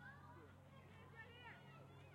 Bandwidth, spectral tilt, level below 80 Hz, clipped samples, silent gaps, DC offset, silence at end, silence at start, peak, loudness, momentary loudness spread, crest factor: 16 kHz; -6 dB/octave; -82 dBFS; under 0.1%; none; under 0.1%; 0 s; 0 s; -48 dBFS; -61 LUFS; 5 LU; 14 dB